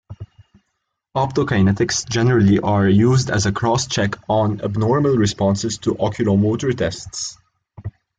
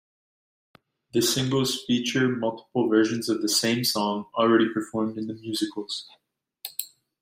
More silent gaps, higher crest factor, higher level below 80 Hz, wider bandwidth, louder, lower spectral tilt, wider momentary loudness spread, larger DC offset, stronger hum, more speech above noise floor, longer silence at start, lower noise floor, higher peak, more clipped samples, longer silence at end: neither; about the same, 14 dB vs 18 dB; first, -46 dBFS vs -66 dBFS; second, 9.4 kHz vs 16 kHz; first, -18 LUFS vs -25 LUFS; first, -5.5 dB/octave vs -4 dB/octave; about the same, 12 LU vs 12 LU; neither; neither; first, 57 dB vs 20 dB; second, 0.1 s vs 1.15 s; first, -75 dBFS vs -44 dBFS; first, -4 dBFS vs -8 dBFS; neither; about the same, 0.3 s vs 0.35 s